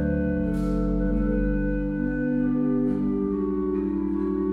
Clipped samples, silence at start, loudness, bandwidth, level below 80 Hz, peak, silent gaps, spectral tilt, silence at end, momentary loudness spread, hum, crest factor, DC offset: under 0.1%; 0 s; -25 LUFS; 4.7 kHz; -32 dBFS; -12 dBFS; none; -10.5 dB/octave; 0 s; 2 LU; none; 12 dB; under 0.1%